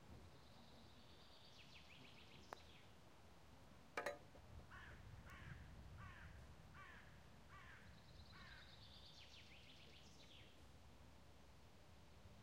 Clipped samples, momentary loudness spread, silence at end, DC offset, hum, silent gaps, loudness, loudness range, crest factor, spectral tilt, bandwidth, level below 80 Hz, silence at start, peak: under 0.1%; 8 LU; 0 s; under 0.1%; none; none; -61 LUFS; 7 LU; 30 dB; -4.5 dB/octave; 15.5 kHz; -70 dBFS; 0 s; -32 dBFS